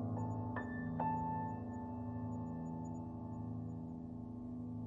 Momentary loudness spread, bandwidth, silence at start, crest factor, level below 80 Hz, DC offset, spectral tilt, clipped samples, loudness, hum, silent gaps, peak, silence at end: 8 LU; 7.4 kHz; 0 s; 18 dB; -64 dBFS; under 0.1%; -10 dB/octave; under 0.1%; -44 LUFS; none; none; -26 dBFS; 0 s